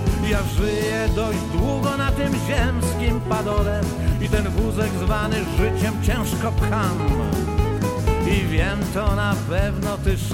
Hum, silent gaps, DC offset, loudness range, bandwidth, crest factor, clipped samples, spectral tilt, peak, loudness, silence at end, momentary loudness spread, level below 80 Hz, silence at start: none; none; under 0.1%; 0 LU; 16.5 kHz; 14 dB; under 0.1%; -6 dB/octave; -6 dBFS; -22 LUFS; 0 s; 2 LU; -26 dBFS; 0 s